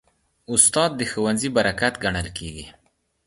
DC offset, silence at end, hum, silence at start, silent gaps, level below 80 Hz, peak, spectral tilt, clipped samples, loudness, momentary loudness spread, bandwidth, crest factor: under 0.1%; 0.55 s; none; 0.5 s; none; -46 dBFS; 0 dBFS; -2.5 dB/octave; under 0.1%; -20 LUFS; 17 LU; 11.5 kHz; 24 dB